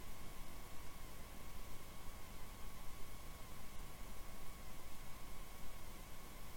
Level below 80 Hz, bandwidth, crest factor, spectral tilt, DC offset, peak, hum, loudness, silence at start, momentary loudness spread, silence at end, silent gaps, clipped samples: -54 dBFS; 17 kHz; 10 dB; -3.5 dB/octave; under 0.1%; -34 dBFS; none; -55 LUFS; 0 s; 1 LU; 0 s; none; under 0.1%